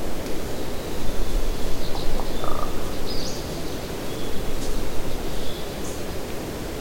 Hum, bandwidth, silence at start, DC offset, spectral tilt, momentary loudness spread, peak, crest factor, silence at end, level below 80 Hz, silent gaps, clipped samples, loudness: none; 16.5 kHz; 0 s; under 0.1%; -4.5 dB/octave; 2 LU; -8 dBFS; 12 dB; 0 s; -28 dBFS; none; under 0.1%; -30 LUFS